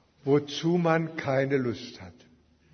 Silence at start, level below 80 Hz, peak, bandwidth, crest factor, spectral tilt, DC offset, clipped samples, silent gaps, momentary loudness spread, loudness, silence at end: 0.25 s; -66 dBFS; -8 dBFS; 6.6 kHz; 20 dB; -6.5 dB/octave; under 0.1%; under 0.1%; none; 14 LU; -27 LUFS; 0.6 s